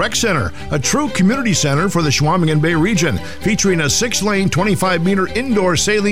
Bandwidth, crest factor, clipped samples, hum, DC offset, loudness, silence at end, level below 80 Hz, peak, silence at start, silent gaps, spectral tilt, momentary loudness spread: 16 kHz; 10 dB; under 0.1%; none; 3%; -15 LUFS; 0 s; -36 dBFS; -4 dBFS; 0 s; none; -4 dB/octave; 4 LU